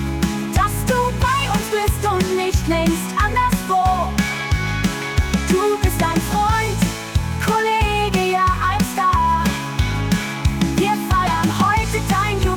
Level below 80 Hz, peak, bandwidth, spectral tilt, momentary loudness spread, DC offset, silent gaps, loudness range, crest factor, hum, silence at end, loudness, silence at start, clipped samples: -28 dBFS; -6 dBFS; 19.5 kHz; -5 dB/octave; 4 LU; under 0.1%; none; 1 LU; 12 dB; none; 0 s; -19 LUFS; 0 s; under 0.1%